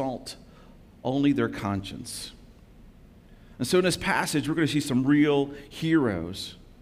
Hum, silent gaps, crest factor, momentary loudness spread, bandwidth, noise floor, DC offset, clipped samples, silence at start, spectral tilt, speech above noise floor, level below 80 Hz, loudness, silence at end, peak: none; none; 18 dB; 15 LU; 16 kHz; -51 dBFS; under 0.1%; under 0.1%; 0 s; -5 dB/octave; 26 dB; -52 dBFS; -26 LUFS; 0.25 s; -10 dBFS